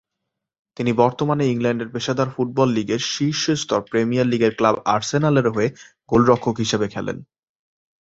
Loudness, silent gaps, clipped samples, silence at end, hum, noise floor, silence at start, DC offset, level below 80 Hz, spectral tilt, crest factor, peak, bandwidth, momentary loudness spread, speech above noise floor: -20 LUFS; none; under 0.1%; 0.8 s; none; -81 dBFS; 0.8 s; under 0.1%; -52 dBFS; -5.5 dB/octave; 18 dB; -2 dBFS; 8 kHz; 7 LU; 61 dB